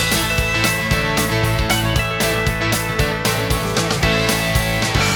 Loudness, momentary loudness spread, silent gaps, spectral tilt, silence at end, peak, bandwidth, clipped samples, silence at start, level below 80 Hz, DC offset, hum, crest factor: -17 LUFS; 2 LU; none; -3.5 dB/octave; 0 s; -2 dBFS; 19.5 kHz; under 0.1%; 0 s; -28 dBFS; under 0.1%; none; 16 dB